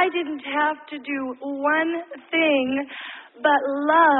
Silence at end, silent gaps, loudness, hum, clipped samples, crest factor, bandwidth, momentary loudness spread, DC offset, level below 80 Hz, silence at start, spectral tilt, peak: 0 s; none; -23 LUFS; none; under 0.1%; 16 dB; 4.1 kHz; 12 LU; under 0.1%; -70 dBFS; 0 s; -8 dB/octave; -6 dBFS